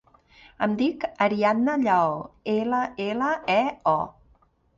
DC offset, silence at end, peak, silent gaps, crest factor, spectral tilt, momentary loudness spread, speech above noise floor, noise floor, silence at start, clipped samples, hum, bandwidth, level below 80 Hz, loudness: under 0.1%; 0.65 s; -6 dBFS; none; 18 dB; -6.5 dB/octave; 7 LU; 38 dB; -62 dBFS; 0.6 s; under 0.1%; none; 7.6 kHz; -62 dBFS; -24 LUFS